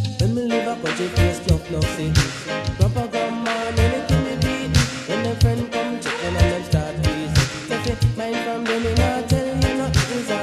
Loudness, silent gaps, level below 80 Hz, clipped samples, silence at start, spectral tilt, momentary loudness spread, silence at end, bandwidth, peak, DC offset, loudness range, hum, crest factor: -21 LUFS; none; -30 dBFS; under 0.1%; 0 s; -5.5 dB/octave; 4 LU; 0 s; 14.5 kHz; -2 dBFS; under 0.1%; 1 LU; none; 18 dB